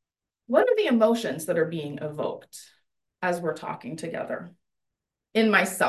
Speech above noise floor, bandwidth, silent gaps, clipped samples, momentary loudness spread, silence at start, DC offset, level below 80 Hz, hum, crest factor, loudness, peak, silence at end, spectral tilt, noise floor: 59 dB; 12.5 kHz; none; under 0.1%; 14 LU; 0.5 s; under 0.1%; -76 dBFS; none; 22 dB; -26 LUFS; -6 dBFS; 0 s; -4.5 dB/octave; -85 dBFS